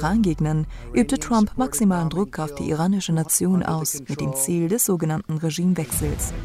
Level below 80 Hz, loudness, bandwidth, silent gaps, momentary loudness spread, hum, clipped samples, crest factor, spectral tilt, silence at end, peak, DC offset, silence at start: -38 dBFS; -22 LUFS; 16 kHz; none; 6 LU; none; under 0.1%; 16 dB; -5.5 dB/octave; 0 s; -6 dBFS; under 0.1%; 0 s